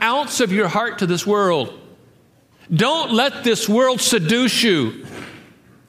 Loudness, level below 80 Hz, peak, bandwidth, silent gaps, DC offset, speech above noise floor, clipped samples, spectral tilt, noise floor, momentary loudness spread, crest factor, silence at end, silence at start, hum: -17 LUFS; -62 dBFS; -4 dBFS; 15.5 kHz; none; under 0.1%; 36 dB; under 0.1%; -4 dB/octave; -54 dBFS; 12 LU; 16 dB; 0.5 s; 0 s; none